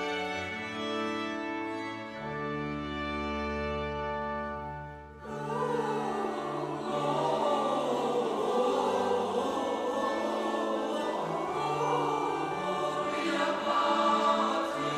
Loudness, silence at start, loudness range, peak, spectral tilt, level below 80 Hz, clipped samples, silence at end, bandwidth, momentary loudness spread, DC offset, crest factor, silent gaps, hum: -31 LUFS; 0 s; 5 LU; -14 dBFS; -5 dB/octave; -54 dBFS; under 0.1%; 0 s; 14.5 kHz; 8 LU; under 0.1%; 16 dB; none; none